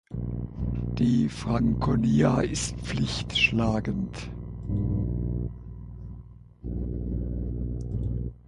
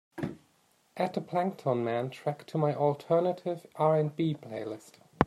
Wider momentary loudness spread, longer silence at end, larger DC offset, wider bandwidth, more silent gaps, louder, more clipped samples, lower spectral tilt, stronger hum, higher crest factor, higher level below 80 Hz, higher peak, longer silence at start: first, 16 LU vs 12 LU; about the same, 0.1 s vs 0 s; neither; second, 11.5 kHz vs 13 kHz; neither; first, -28 LUFS vs -31 LUFS; neither; second, -5.5 dB/octave vs -8 dB/octave; first, 60 Hz at -35 dBFS vs none; second, 18 dB vs 28 dB; first, -36 dBFS vs -62 dBFS; second, -10 dBFS vs -4 dBFS; about the same, 0.1 s vs 0.15 s